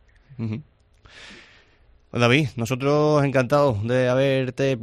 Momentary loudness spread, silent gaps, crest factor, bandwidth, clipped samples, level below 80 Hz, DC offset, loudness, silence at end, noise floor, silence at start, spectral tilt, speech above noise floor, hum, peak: 14 LU; none; 20 dB; 13.5 kHz; under 0.1%; -54 dBFS; under 0.1%; -21 LUFS; 0 s; -56 dBFS; 0.3 s; -6.5 dB/octave; 35 dB; none; -2 dBFS